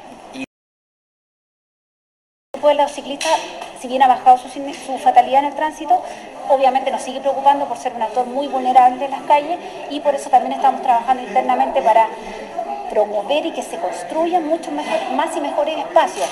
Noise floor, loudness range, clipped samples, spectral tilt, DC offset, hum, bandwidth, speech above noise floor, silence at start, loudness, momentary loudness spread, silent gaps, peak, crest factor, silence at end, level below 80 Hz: under -90 dBFS; 4 LU; under 0.1%; -3 dB/octave; under 0.1%; none; 12.5 kHz; over 73 dB; 0 s; -17 LUFS; 14 LU; 0.47-2.54 s; 0 dBFS; 18 dB; 0 s; -58 dBFS